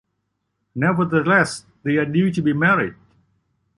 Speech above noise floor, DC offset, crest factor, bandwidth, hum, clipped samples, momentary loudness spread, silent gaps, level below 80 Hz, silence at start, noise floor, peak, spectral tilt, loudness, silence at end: 56 dB; under 0.1%; 18 dB; 11.5 kHz; none; under 0.1%; 10 LU; none; -58 dBFS; 0.75 s; -74 dBFS; -2 dBFS; -6.5 dB/octave; -19 LUFS; 0.85 s